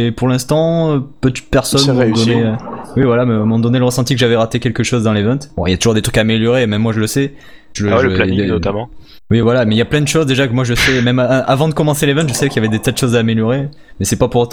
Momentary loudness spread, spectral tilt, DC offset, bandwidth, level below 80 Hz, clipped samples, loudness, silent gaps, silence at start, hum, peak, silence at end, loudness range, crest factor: 6 LU; -5.5 dB/octave; 0.7%; 19.5 kHz; -34 dBFS; under 0.1%; -14 LUFS; none; 0 s; none; 0 dBFS; 0 s; 2 LU; 12 dB